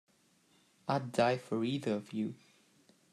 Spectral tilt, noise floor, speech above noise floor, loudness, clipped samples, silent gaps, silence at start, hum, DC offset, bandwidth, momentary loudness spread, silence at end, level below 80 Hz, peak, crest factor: -6 dB/octave; -70 dBFS; 36 dB; -35 LUFS; under 0.1%; none; 0.85 s; none; under 0.1%; 13.5 kHz; 11 LU; 0.75 s; -78 dBFS; -14 dBFS; 22 dB